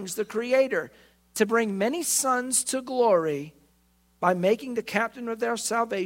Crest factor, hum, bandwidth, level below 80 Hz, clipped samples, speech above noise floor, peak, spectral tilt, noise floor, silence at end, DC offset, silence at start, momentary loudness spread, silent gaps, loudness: 20 dB; none; 16.5 kHz; -68 dBFS; under 0.1%; 39 dB; -6 dBFS; -3 dB/octave; -64 dBFS; 0 s; under 0.1%; 0 s; 8 LU; none; -25 LUFS